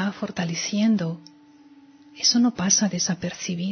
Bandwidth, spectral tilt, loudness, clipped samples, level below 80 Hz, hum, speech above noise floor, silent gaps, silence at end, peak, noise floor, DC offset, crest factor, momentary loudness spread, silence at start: 6.6 kHz; -3 dB/octave; -22 LUFS; under 0.1%; -62 dBFS; none; 28 dB; none; 0 s; -6 dBFS; -51 dBFS; under 0.1%; 20 dB; 10 LU; 0 s